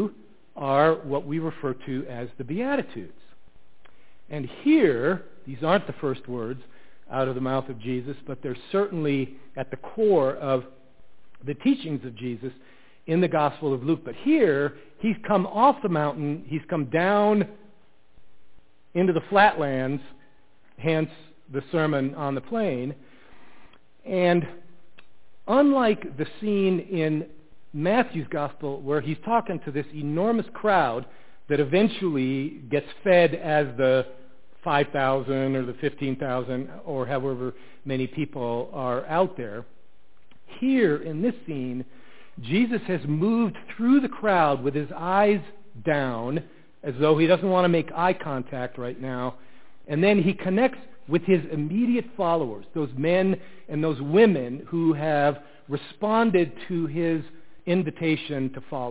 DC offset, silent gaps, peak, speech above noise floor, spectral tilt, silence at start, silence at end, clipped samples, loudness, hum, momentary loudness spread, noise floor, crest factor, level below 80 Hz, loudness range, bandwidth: 1%; none; -4 dBFS; 39 dB; -11 dB/octave; 0 s; 0 s; under 0.1%; -25 LUFS; none; 14 LU; -63 dBFS; 22 dB; -64 dBFS; 5 LU; 4 kHz